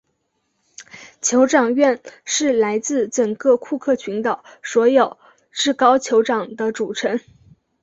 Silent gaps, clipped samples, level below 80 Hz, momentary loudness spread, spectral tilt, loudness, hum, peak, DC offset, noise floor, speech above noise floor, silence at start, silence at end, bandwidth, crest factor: none; under 0.1%; -66 dBFS; 10 LU; -3 dB/octave; -19 LUFS; none; -2 dBFS; under 0.1%; -70 dBFS; 52 dB; 0.8 s; 0.65 s; 8.2 kHz; 18 dB